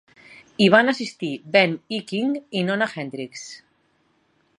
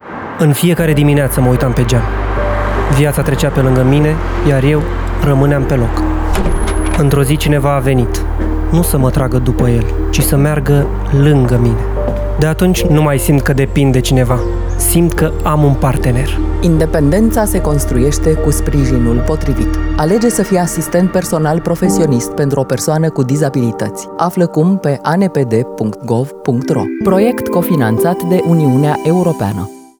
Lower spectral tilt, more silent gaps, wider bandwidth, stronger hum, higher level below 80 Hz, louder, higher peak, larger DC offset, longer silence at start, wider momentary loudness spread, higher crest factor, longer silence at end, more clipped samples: second, -5 dB/octave vs -6.5 dB/octave; neither; second, 11 kHz vs over 20 kHz; neither; second, -68 dBFS vs -20 dBFS; second, -21 LUFS vs -13 LUFS; about the same, -2 dBFS vs 0 dBFS; neither; first, 0.3 s vs 0.05 s; first, 18 LU vs 5 LU; first, 22 dB vs 12 dB; first, 1.05 s vs 0.2 s; neither